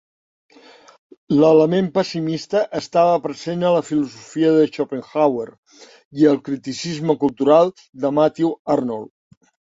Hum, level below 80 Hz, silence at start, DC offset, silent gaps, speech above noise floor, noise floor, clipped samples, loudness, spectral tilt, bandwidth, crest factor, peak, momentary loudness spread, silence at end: none; -62 dBFS; 1.3 s; under 0.1%; 5.58-5.63 s, 6.05-6.11 s, 7.89-7.93 s, 8.59-8.65 s; 29 dB; -47 dBFS; under 0.1%; -19 LUFS; -6.5 dB/octave; 7.8 kHz; 16 dB; -2 dBFS; 11 LU; 0.65 s